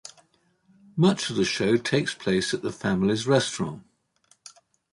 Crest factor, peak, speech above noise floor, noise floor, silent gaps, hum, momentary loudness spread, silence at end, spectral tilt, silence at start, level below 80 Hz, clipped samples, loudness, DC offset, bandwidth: 20 dB; -8 dBFS; 41 dB; -65 dBFS; none; none; 11 LU; 1.15 s; -5 dB/octave; 0.05 s; -58 dBFS; under 0.1%; -25 LUFS; under 0.1%; 11.5 kHz